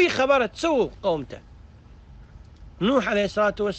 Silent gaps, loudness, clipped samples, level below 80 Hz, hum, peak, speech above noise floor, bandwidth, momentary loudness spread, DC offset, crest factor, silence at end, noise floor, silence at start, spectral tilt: none; -23 LUFS; under 0.1%; -48 dBFS; none; -8 dBFS; 24 dB; 8.8 kHz; 9 LU; under 0.1%; 16 dB; 0 s; -47 dBFS; 0 s; -5 dB/octave